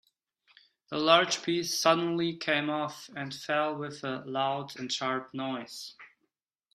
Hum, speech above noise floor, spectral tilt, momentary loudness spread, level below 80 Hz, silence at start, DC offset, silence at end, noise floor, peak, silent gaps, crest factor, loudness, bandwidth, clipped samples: none; 51 dB; -3.5 dB/octave; 15 LU; -76 dBFS; 0.9 s; under 0.1%; 0.7 s; -81 dBFS; -6 dBFS; none; 24 dB; -29 LUFS; 15.5 kHz; under 0.1%